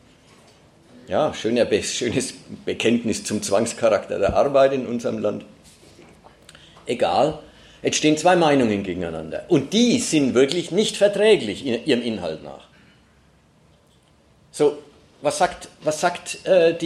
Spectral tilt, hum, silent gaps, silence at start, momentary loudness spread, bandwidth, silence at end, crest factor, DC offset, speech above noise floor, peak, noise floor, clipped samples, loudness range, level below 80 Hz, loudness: -4 dB/octave; none; none; 1.1 s; 12 LU; 14 kHz; 0 s; 18 dB; under 0.1%; 36 dB; -4 dBFS; -57 dBFS; under 0.1%; 8 LU; -54 dBFS; -21 LUFS